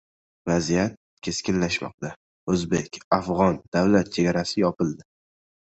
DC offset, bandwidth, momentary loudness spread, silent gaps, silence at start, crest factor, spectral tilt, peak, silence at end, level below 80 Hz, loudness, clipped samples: under 0.1%; 8.2 kHz; 14 LU; 0.97-1.17 s, 1.94-1.98 s, 2.16-2.47 s, 3.04-3.11 s, 3.68-3.72 s; 0.45 s; 20 dB; -5.5 dB/octave; -4 dBFS; 0.7 s; -50 dBFS; -24 LUFS; under 0.1%